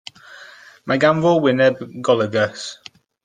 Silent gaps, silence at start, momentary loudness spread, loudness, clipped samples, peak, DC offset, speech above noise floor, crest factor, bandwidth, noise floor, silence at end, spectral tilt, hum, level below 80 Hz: none; 0.3 s; 20 LU; -17 LUFS; under 0.1%; -2 dBFS; under 0.1%; 26 dB; 18 dB; 9.6 kHz; -43 dBFS; 0.5 s; -5.5 dB/octave; none; -62 dBFS